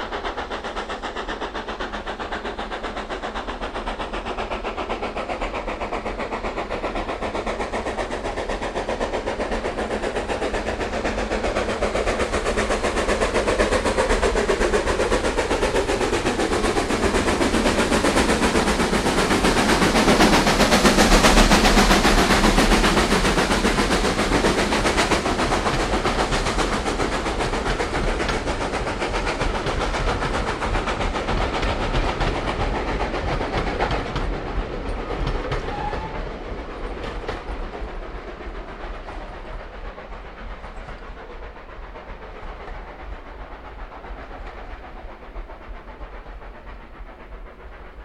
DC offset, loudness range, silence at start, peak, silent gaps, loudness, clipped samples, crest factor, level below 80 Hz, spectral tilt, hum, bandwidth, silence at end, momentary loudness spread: under 0.1%; 21 LU; 0 s; -2 dBFS; none; -22 LUFS; under 0.1%; 20 dB; -30 dBFS; -4 dB/octave; none; 15.5 kHz; 0 s; 21 LU